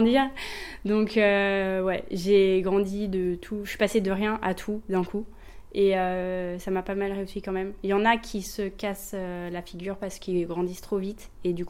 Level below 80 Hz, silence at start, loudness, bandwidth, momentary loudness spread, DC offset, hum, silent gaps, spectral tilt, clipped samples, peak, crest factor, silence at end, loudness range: -48 dBFS; 0 s; -27 LUFS; 16.5 kHz; 12 LU; under 0.1%; none; none; -5.5 dB/octave; under 0.1%; -8 dBFS; 18 dB; 0 s; 5 LU